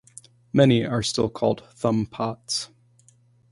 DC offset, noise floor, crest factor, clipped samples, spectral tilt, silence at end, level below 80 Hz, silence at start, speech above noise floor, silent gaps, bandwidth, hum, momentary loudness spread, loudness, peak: under 0.1%; -58 dBFS; 20 dB; under 0.1%; -5.5 dB/octave; 0.85 s; -54 dBFS; 0.55 s; 36 dB; none; 11.5 kHz; none; 10 LU; -23 LUFS; -4 dBFS